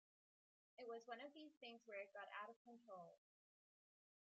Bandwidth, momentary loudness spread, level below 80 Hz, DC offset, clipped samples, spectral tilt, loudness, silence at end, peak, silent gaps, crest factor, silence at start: 7.4 kHz; 7 LU; under -90 dBFS; under 0.1%; under 0.1%; -1 dB/octave; -58 LUFS; 1.2 s; -40 dBFS; 1.57-1.61 s, 2.56-2.65 s; 20 dB; 0.8 s